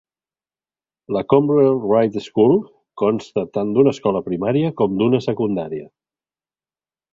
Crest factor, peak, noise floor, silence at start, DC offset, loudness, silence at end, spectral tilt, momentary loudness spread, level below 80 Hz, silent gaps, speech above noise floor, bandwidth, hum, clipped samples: 18 dB; -2 dBFS; under -90 dBFS; 1.1 s; under 0.1%; -18 LUFS; 1.25 s; -8.5 dB/octave; 9 LU; -56 dBFS; none; over 73 dB; 7.6 kHz; none; under 0.1%